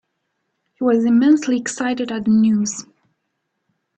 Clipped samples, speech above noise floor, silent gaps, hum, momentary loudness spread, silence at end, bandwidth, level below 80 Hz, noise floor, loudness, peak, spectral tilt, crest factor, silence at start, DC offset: under 0.1%; 57 dB; none; none; 8 LU; 1.15 s; 8.8 kHz; -62 dBFS; -74 dBFS; -17 LUFS; -4 dBFS; -5 dB/octave; 14 dB; 0.8 s; under 0.1%